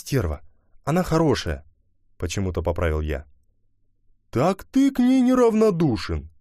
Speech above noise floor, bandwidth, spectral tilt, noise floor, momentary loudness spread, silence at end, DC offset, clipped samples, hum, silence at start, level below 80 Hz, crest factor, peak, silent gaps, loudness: 42 dB; 15 kHz; -6.5 dB/octave; -63 dBFS; 14 LU; 0.1 s; under 0.1%; under 0.1%; none; 0.05 s; -38 dBFS; 16 dB; -8 dBFS; none; -22 LUFS